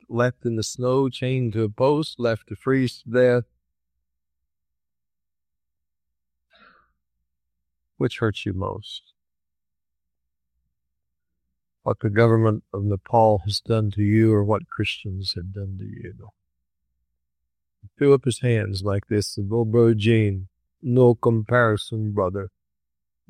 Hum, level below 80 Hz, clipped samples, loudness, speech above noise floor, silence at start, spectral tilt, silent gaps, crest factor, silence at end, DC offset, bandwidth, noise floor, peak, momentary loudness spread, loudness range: none; -58 dBFS; under 0.1%; -22 LUFS; 69 dB; 0.1 s; -7 dB/octave; none; 20 dB; 0.8 s; under 0.1%; 11.5 kHz; -90 dBFS; -4 dBFS; 15 LU; 12 LU